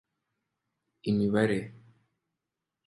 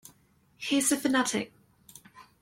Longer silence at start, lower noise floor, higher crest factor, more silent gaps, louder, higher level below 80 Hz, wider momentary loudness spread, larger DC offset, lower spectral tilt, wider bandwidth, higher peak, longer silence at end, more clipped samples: first, 1.05 s vs 0.6 s; first, -87 dBFS vs -64 dBFS; about the same, 22 dB vs 20 dB; neither; about the same, -29 LUFS vs -27 LUFS; first, -64 dBFS vs -70 dBFS; about the same, 14 LU vs 13 LU; neither; first, -7.5 dB/octave vs -2 dB/octave; second, 11.5 kHz vs 16.5 kHz; about the same, -12 dBFS vs -12 dBFS; first, 1.15 s vs 0.2 s; neither